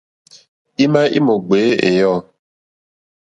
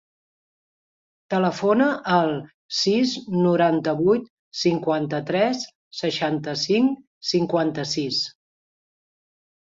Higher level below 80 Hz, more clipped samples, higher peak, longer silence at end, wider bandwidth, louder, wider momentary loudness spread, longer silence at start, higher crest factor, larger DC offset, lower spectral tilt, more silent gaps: first, -58 dBFS vs -66 dBFS; neither; first, 0 dBFS vs -6 dBFS; second, 1.15 s vs 1.35 s; first, 9.2 kHz vs 7.8 kHz; first, -15 LUFS vs -22 LUFS; about the same, 6 LU vs 8 LU; second, 0.8 s vs 1.3 s; about the same, 16 dB vs 18 dB; neither; first, -6.5 dB/octave vs -5 dB/octave; second, none vs 2.54-2.69 s, 4.30-4.51 s, 5.75-5.91 s, 7.07-7.21 s